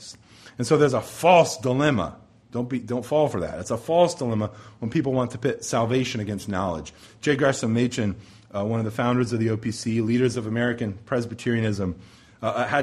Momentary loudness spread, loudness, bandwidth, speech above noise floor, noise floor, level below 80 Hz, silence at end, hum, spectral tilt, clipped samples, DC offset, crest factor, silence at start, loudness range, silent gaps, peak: 11 LU; -24 LUFS; 14 kHz; 23 dB; -46 dBFS; -54 dBFS; 0 s; none; -6 dB/octave; under 0.1%; under 0.1%; 22 dB; 0 s; 3 LU; none; -2 dBFS